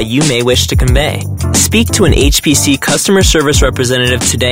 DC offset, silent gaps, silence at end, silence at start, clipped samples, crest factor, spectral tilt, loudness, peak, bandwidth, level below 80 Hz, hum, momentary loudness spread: under 0.1%; none; 0 s; 0 s; under 0.1%; 10 dB; -4 dB/octave; -10 LUFS; 0 dBFS; 16.5 kHz; -18 dBFS; none; 3 LU